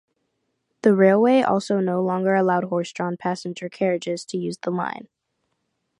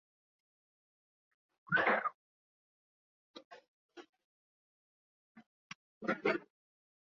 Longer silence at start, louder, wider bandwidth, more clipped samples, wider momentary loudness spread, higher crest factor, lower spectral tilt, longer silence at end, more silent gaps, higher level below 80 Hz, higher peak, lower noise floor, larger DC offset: second, 0.85 s vs 1.7 s; first, -22 LUFS vs -35 LUFS; first, 11 kHz vs 7 kHz; neither; second, 12 LU vs 27 LU; second, 18 dB vs 26 dB; first, -6.5 dB/octave vs -2.5 dB/octave; first, 1 s vs 0.6 s; second, none vs 2.15-3.34 s, 3.45-3.51 s, 3.68-3.89 s, 4.09-4.13 s, 4.24-5.35 s, 5.46-6.01 s; first, -72 dBFS vs -82 dBFS; first, -4 dBFS vs -18 dBFS; second, -75 dBFS vs under -90 dBFS; neither